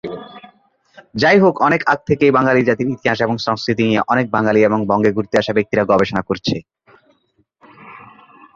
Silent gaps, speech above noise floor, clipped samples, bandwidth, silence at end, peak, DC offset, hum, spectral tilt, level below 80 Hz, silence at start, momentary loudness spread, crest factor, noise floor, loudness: none; 47 dB; under 0.1%; 7.4 kHz; 0.5 s; 0 dBFS; under 0.1%; none; -6.5 dB/octave; -50 dBFS; 0.05 s; 8 LU; 16 dB; -62 dBFS; -16 LUFS